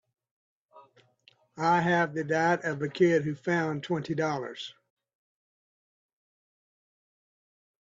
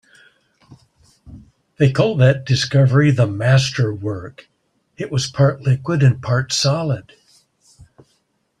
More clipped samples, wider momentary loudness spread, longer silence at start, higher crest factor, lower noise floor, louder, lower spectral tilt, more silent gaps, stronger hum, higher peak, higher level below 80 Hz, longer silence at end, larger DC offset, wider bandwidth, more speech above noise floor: neither; about the same, 10 LU vs 12 LU; second, 0.75 s vs 1.25 s; about the same, 20 dB vs 16 dB; about the same, -64 dBFS vs -66 dBFS; second, -28 LUFS vs -17 LUFS; about the same, -6 dB/octave vs -6 dB/octave; neither; neither; second, -12 dBFS vs -2 dBFS; second, -74 dBFS vs -52 dBFS; first, 3.2 s vs 1.6 s; neither; second, 7.8 kHz vs 10.5 kHz; second, 37 dB vs 49 dB